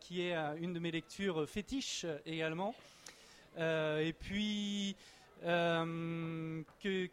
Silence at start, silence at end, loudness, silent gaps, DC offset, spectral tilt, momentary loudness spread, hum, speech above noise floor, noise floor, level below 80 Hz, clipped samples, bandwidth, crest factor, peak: 0 s; 0.05 s; -39 LUFS; none; under 0.1%; -5 dB/octave; 18 LU; none; 20 dB; -58 dBFS; -64 dBFS; under 0.1%; 15 kHz; 16 dB; -22 dBFS